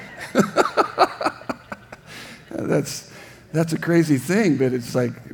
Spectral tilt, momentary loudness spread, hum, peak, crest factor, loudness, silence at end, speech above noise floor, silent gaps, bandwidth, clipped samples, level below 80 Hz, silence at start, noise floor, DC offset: -6 dB/octave; 19 LU; none; 0 dBFS; 22 dB; -21 LUFS; 0 s; 21 dB; none; 19.5 kHz; under 0.1%; -60 dBFS; 0 s; -41 dBFS; under 0.1%